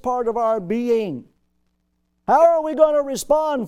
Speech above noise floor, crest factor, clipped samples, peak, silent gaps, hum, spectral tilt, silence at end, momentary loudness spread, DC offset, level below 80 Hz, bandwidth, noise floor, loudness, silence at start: 51 dB; 18 dB; under 0.1%; -2 dBFS; none; none; -5 dB/octave; 0 s; 11 LU; under 0.1%; -54 dBFS; 16 kHz; -69 dBFS; -19 LUFS; 0.05 s